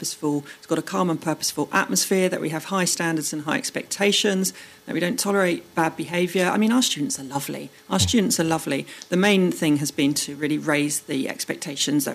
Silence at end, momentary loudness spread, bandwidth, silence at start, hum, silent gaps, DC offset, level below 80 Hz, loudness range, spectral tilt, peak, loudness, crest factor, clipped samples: 0 s; 8 LU; 15.5 kHz; 0 s; none; none; under 0.1%; -58 dBFS; 1 LU; -3.5 dB/octave; -6 dBFS; -23 LUFS; 18 dB; under 0.1%